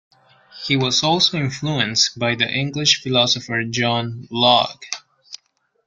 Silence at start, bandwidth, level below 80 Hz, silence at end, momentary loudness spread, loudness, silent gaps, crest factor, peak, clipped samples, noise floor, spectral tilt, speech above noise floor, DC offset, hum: 0.55 s; 9.4 kHz; -58 dBFS; 0.5 s; 16 LU; -18 LUFS; none; 20 dB; 0 dBFS; under 0.1%; -65 dBFS; -3 dB/octave; 46 dB; under 0.1%; none